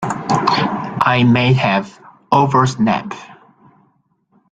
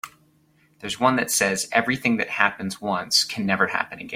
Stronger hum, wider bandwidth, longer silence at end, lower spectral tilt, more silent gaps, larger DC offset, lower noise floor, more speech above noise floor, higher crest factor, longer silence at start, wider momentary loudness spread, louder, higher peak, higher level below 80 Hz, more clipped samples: neither; second, 9.2 kHz vs 16.5 kHz; first, 1.2 s vs 0 s; first, -6 dB/octave vs -2.5 dB/octave; neither; neither; about the same, -60 dBFS vs -61 dBFS; first, 46 dB vs 38 dB; second, 16 dB vs 24 dB; about the same, 0 s vs 0.05 s; about the same, 9 LU vs 9 LU; first, -15 LUFS vs -22 LUFS; about the same, 0 dBFS vs 0 dBFS; first, -52 dBFS vs -62 dBFS; neither